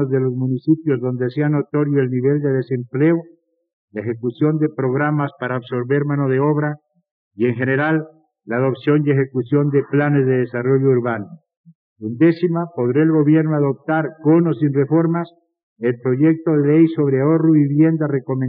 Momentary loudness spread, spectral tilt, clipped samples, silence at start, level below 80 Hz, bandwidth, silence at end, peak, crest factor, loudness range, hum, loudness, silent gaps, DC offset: 9 LU; -8.5 dB/octave; under 0.1%; 0 s; -80 dBFS; 4.7 kHz; 0 s; -4 dBFS; 14 dB; 4 LU; none; -18 LUFS; 3.73-3.88 s, 7.11-7.31 s, 11.57-11.64 s, 11.75-11.96 s, 15.63-15.76 s; under 0.1%